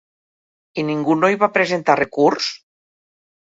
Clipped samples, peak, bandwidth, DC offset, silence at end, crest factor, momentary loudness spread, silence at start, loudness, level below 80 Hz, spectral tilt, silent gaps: under 0.1%; 0 dBFS; 7.8 kHz; under 0.1%; 0.9 s; 20 dB; 10 LU; 0.75 s; -18 LUFS; -64 dBFS; -5 dB/octave; none